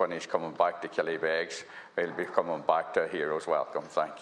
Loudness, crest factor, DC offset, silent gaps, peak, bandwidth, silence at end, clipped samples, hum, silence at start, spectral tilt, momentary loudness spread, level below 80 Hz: -31 LUFS; 22 dB; under 0.1%; none; -8 dBFS; 10.5 kHz; 0 s; under 0.1%; none; 0 s; -4 dB/octave; 5 LU; -78 dBFS